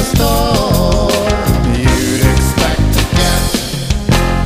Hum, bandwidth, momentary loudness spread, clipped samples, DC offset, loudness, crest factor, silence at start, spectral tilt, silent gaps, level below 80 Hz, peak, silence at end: none; 15.5 kHz; 2 LU; under 0.1%; under 0.1%; -13 LUFS; 10 dB; 0 s; -5 dB/octave; none; -18 dBFS; -2 dBFS; 0 s